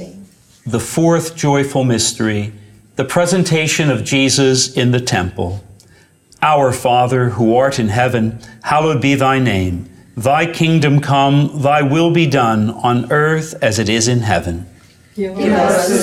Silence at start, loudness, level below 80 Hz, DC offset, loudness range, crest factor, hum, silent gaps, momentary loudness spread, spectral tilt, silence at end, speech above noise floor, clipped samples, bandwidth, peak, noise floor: 0 s; -14 LUFS; -46 dBFS; under 0.1%; 2 LU; 14 dB; none; none; 11 LU; -5 dB/octave; 0 s; 34 dB; under 0.1%; 16 kHz; -2 dBFS; -48 dBFS